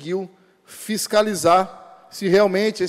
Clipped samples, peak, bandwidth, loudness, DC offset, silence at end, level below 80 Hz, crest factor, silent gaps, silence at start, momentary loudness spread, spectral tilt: under 0.1%; -6 dBFS; 16 kHz; -19 LUFS; under 0.1%; 0 s; -62 dBFS; 14 dB; none; 0 s; 19 LU; -4.5 dB/octave